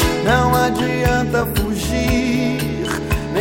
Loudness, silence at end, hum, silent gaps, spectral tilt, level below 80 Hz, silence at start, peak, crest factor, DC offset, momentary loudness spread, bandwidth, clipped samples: -18 LUFS; 0 s; none; none; -5.5 dB/octave; -28 dBFS; 0 s; -2 dBFS; 16 dB; 0.3%; 6 LU; 16.5 kHz; under 0.1%